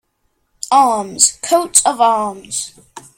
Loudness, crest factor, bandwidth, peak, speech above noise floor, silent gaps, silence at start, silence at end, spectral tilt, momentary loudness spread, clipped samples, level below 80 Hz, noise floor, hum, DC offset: -14 LUFS; 16 dB; 16.5 kHz; 0 dBFS; 51 dB; none; 0.65 s; 0.2 s; -1 dB/octave; 12 LU; under 0.1%; -58 dBFS; -66 dBFS; none; under 0.1%